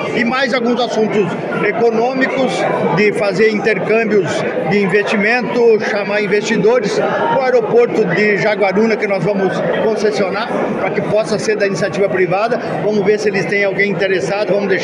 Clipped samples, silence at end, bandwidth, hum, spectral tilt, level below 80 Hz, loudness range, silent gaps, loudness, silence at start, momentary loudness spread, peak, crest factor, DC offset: under 0.1%; 0 s; 11 kHz; none; -5.5 dB/octave; -58 dBFS; 2 LU; none; -14 LUFS; 0 s; 4 LU; -2 dBFS; 14 dB; under 0.1%